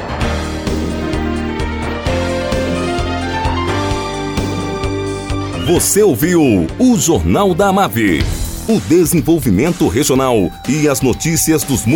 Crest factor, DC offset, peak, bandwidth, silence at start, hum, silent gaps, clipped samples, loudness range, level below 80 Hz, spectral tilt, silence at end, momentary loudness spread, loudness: 12 dB; under 0.1%; -2 dBFS; 19 kHz; 0 s; none; none; under 0.1%; 6 LU; -28 dBFS; -5 dB/octave; 0 s; 8 LU; -15 LUFS